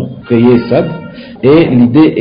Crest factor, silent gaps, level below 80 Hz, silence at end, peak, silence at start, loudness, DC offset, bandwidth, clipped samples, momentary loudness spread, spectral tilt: 8 dB; none; -40 dBFS; 0 s; 0 dBFS; 0 s; -9 LUFS; under 0.1%; 5.2 kHz; under 0.1%; 14 LU; -11.5 dB/octave